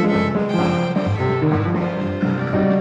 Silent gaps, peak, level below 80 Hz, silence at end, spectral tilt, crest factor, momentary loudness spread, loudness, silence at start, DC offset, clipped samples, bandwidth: none; -6 dBFS; -48 dBFS; 0 s; -8 dB/octave; 12 dB; 3 LU; -20 LUFS; 0 s; under 0.1%; under 0.1%; 8.2 kHz